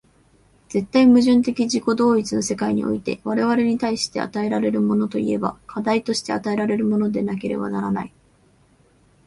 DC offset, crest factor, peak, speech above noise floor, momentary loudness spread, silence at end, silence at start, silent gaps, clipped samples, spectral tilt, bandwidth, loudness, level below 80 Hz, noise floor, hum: under 0.1%; 16 dB; -4 dBFS; 37 dB; 9 LU; 1.2 s; 0.7 s; none; under 0.1%; -5.5 dB/octave; 11.5 kHz; -21 LUFS; -56 dBFS; -57 dBFS; none